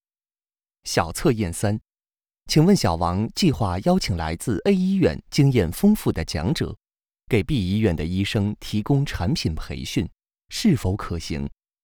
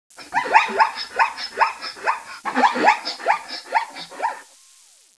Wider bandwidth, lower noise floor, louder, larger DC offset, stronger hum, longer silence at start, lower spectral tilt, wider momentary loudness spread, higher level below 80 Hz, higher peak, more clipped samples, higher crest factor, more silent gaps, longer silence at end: first, over 20 kHz vs 11 kHz; first, under -90 dBFS vs -52 dBFS; about the same, -23 LUFS vs -21 LUFS; neither; neither; first, 0.85 s vs 0.2 s; first, -6 dB/octave vs -1.5 dB/octave; about the same, 9 LU vs 11 LU; first, -40 dBFS vs -68 dBFS; second, -4 dBFS vs 0 dBFS; neither; about the same, 18 dB vs 22 dB; neither; second, 0.35 s vs 0.75 s